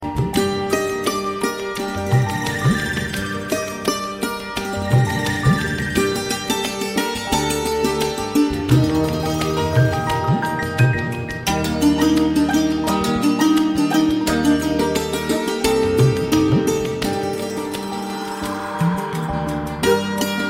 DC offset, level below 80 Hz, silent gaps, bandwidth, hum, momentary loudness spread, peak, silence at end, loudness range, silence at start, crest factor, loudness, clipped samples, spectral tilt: under 0.1%; -38 dBFS; none; 16 kHz; none; 8 LU; -2 dBFS; 0 s; 4 LU; 0 s; 16 dB; -20 LUFS; under 0.1%; -5.5 dB/octave